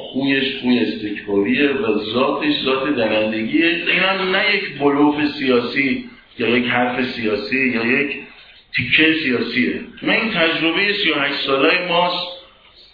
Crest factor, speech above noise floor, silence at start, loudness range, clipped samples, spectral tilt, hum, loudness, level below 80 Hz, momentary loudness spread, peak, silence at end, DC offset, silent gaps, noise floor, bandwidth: 18 dB; 29 dB; 0 s; 2 LU; under 0.1%; -7 dB/octave; none; -17 LUFS; -54 dBFS; 7 LU; 0 dBFS; 0.5 s; under 0.1%; none; -47 dBFS; 5.2 kHz